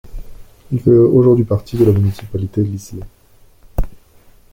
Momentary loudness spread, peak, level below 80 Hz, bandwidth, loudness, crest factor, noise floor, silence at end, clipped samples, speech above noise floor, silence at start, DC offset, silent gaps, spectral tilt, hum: 18 LU; -2 dBFS; -30 dBFS; 17 kHz; -15 LUFS; 14 dB; -47 dBFS; 0.55 s; under 0.1%; 34 dB; 0.05 s; under 0.1%; none; -9.5 dB/octave; none